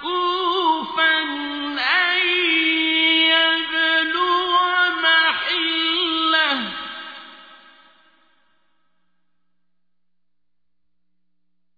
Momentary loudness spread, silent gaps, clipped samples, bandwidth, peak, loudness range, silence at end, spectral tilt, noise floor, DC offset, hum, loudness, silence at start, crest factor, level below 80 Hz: 11 LU; none; under 0.1%; 5 kHz; -6 dBFS; 8 LU; 4.2 s; -3 dB/octave; -83 dBFS; under 0.1%; 60 Hz at -80 dBFS; -17 LUFS; 0 s; 16 dB; -66 dBFS